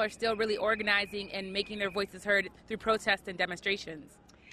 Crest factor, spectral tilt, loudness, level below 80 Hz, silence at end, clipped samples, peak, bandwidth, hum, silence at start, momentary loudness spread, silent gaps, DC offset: 20 dB; -3.5 dB/octave; -31 LUFS; -62 dBFS; 0 s; under 0.1%; -12 dBFS; 13 kHz; none; 0 s; 8 LU; none; under 0.1%